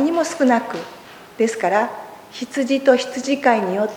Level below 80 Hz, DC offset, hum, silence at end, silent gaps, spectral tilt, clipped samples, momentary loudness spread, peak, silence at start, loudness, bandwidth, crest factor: -66 dBFS; under 0.1%; none; 0 s; none; -4 dB/octave; under 0.1%; 19 LU; -2 dBFS; 0 s; -19 LUFS; 19.5 kHz; 18 dB